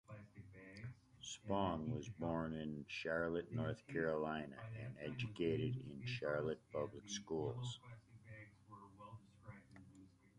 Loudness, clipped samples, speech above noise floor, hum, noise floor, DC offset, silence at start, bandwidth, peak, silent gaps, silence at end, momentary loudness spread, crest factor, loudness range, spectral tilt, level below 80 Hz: -44 LUFS; under 0.1%; 22 dB; none; -65 dBFS; under 0.1%; 0.1 s; 11 kHz; -26 dBFS; none; 0.3 s; 19 LU; 20 dB; 6 LU; -6 dB/octave; -68 dBFS